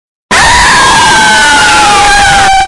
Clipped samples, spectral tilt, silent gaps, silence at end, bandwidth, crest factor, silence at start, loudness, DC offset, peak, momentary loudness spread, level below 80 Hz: 0.5%; -1 dB/octave; none; 0 s; 12 kHz; 4 dB; 0.3 s; -3 LUFS; under 0.1%; 0 dBFS; 1 LU; -22 dBFS